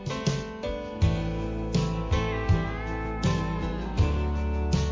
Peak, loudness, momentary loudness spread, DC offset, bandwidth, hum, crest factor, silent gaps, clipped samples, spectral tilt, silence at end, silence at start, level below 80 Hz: -12 dBFS; -28 LUFS; 6 LU; under 0.1%; 7.6 kHz; none; 14 dB; none; under 0.1%; -6.5 dB/octave; 0 s; 0 s; -32 dBFS